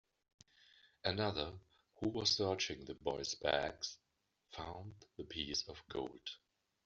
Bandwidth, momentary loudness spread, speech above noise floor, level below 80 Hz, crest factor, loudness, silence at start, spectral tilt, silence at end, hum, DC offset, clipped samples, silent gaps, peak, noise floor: 7.6 kHz; 18 LU; 27 dB; -66 dBFS; 24 dB; -40 LUFS; 1.05 s; -2.5 dB/octave; 0.5 s; none; under 0.1%; under 0.1%; none; -18 dBFS; -68 dBFS